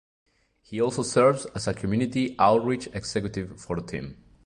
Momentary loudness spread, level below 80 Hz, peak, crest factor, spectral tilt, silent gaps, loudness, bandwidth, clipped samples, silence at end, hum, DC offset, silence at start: 14 LU; -52 dBFS; -6 dBFS; 20 dB; -5.5 dB/octave; none; -26 LUFS; 11.5 kHz; under 0.1%; 0.3 s; none; under 0.1%; 0.7 s